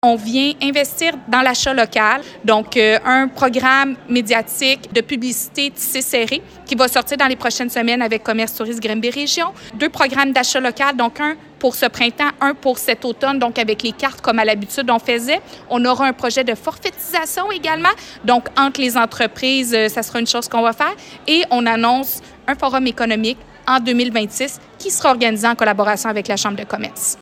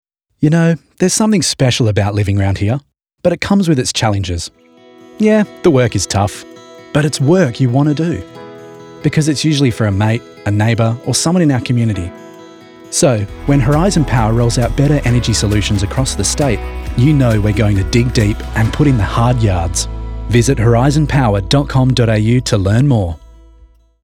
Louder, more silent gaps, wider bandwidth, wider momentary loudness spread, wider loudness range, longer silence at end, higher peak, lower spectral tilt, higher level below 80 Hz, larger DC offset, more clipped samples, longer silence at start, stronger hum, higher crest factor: second, -17 LUFS vs -14 LUFS; neither; first, 16.5 kHz vs 14.5 kHz; about the same, 7 LU vs 7 LU; about the same, 3 LU vs 3 LU; second, 0.05 s vs 0.8 s; about the same, 0 dBFS vs 0 dBFS; second, -2 dB/octave vs -5.5 dB/octave; second, -52 dBFS vs -28 dBFS; neither; neither; second, 0.05 s vs 0.4 s; neither; about the same, 16 dB vs 14 dB